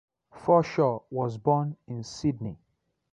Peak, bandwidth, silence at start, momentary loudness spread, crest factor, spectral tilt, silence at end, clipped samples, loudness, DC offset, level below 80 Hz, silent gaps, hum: -10 dBFS; 9.4 kHz; 0.35 s; 14 LU; 18 dB; -7.5 dB/octave; 0.55 s; under 0.1%; -27 LUFS; under 0.1%; -60 dBFS; none; none